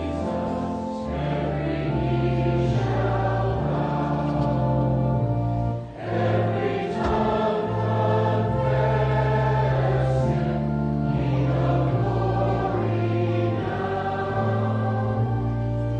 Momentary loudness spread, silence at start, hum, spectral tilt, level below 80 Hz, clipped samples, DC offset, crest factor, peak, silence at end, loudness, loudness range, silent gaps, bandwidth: 4 LU; 0 s; none; -9 dB/octave; -38 dBFS; under 0.1%; under 0.1%; 14 dB; -10 dBFS; 0 s; -24 LUFS; 2 LU; none; 7.4 kHz